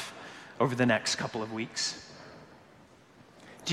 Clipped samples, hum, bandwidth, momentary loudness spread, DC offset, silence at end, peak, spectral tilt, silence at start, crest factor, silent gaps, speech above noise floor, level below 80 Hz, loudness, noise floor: under 0.1%; none; 13.5 kHz; 23 LU; under 0.1%; 0 s; -12 dBFS; -3.5 dB/octave; 0 s; 22 dB; none; 27 dB; -70 dBFS; -30 LUFS; -57 dBFS